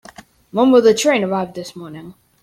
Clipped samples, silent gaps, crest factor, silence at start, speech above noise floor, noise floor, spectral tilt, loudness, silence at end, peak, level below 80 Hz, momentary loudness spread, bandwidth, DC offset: under 0.1%; none; 16 dB; 0.55 s; 27 dB; -43 dBFS; -4.5 dB/octave; -15 LUFS; 0.3 s; -2 dBFS; -58 dBFS; 22 LU; 13.5 kHz; under 0.1%